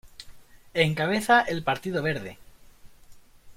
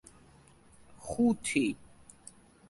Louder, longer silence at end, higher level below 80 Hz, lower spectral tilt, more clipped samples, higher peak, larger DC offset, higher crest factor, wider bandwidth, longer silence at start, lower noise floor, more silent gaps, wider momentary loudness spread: first, -25 LUFS vs -31 LUFS; second, 0.05 s vs 0.95 s; first, -56 dBFS vs -62 dBFS; about the same, -5 dB/octave vs -4.5 dB/octave; neither; first, -6 dBFS vs -14 dBFS; neither; about the same, 22 dB vs 22 dB; first, 16.5 kHz vs 11.5 kHz; second, 0.05 s vs 0.9 s; second, -50 dBFS vs -59 dBFS; neither; about the same, 22 LU vs 24 LU